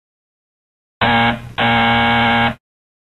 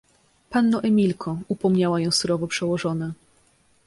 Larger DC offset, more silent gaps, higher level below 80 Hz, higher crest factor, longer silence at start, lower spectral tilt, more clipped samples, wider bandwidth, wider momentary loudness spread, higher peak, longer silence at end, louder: first, 0.4% vs under 0.1%; neither; first, -40 dBFS vs -60 dBFS; about the same, 16 dB vs 16 dB; first, 1 s vs 0.5 s; about the same, -6 dB/octave vs -5.5 dB/octave; neither; about the same, 12.5 kHz vs 11.5 kHz; second, 6 LU vs 10 LU; first, -2 dBFS vs -8 dBFS; second, 0.55 s vs 0.75 s; first, -15 LUFS vs -23 LUFS